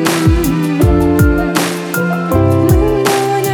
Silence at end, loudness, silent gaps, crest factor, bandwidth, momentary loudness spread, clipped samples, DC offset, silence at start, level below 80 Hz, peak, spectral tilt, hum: 0 s; -12 LUFS; none; 12 dB; 19.5 kHz; 5 LU; under 0.1%; under 0.1%; 0 s; -20 dBFS; 0 dBFS; -6 dB/octave; none